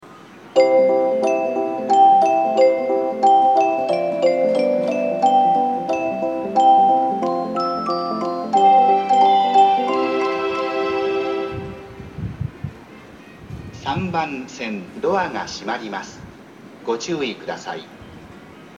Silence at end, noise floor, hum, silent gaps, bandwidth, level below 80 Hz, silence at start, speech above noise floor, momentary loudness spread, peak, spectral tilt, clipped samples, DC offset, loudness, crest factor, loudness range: 0 s; -42 dBFS; none; none; 9 kHz; -52 dBFS; 0.05 s; 17 dB; 16 LU; -2 dBFS; -5.5 dB/octave; under 0.1%; under 0.1%; -18 LUFS; 16 dB; 11 LU